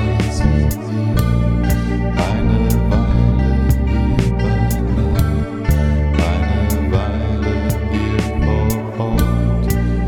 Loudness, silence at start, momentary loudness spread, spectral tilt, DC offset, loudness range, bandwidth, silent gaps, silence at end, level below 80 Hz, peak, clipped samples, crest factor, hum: -17 LUFS; 0 s; 3 LU; -7 dB/octave; under 0.1%; 2 LU; 18 kHz; none; 0 s; -20 dBFS; -2 dBFS; under 0.1%; 14 dB; none